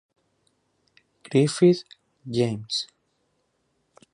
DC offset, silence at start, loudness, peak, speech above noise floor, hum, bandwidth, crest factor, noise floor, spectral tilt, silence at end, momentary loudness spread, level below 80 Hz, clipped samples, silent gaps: under 0.1%; 1.3 s; -23 LUFS; -6 dBFS; 50 dB; none; 11 kHz; 20 dB; -72 dBFS; -6 dB/octave; 1.3 s; 14 LU; -68 dBFS; under 0.1%; none